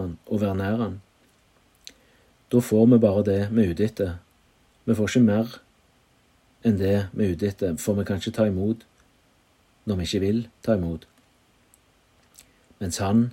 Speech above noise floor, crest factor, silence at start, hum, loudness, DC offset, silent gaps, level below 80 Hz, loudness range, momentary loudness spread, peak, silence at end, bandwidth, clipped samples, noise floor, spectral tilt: 39 dB; 18 dB; 0 s; none; -24 LUFS; under 0.1%; none; -56 dBFS; 7 LU; 13 LU; -6 dBFS; 0 s; 16 kHz; under 0.1%; -62 dBFS; -7 dB/octave